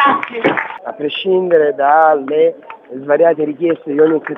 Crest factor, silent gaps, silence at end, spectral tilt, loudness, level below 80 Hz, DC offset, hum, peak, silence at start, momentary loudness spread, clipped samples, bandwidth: 14 dB; none; 0 s; -7.5 dB/octave; -14 LUFS; -66 dBFS; under 0.1%; none; 0 dBFS; 0 s; 12 LU; under 0.1%; 4 kHz